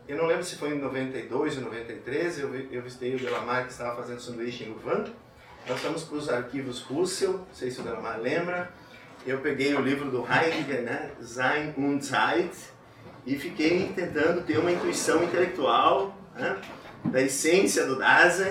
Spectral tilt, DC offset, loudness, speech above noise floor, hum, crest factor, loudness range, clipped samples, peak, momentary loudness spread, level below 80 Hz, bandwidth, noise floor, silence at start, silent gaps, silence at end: -4 dB/octave; under 0.1%; -27 LUFS; 21 dB; none; 20 dB; 7 LU; under 0.1%; -8 dBFS; 13 LU; -64 dBFS; 16.5 kHz; -49 dBFS; 0 s; none; 0 s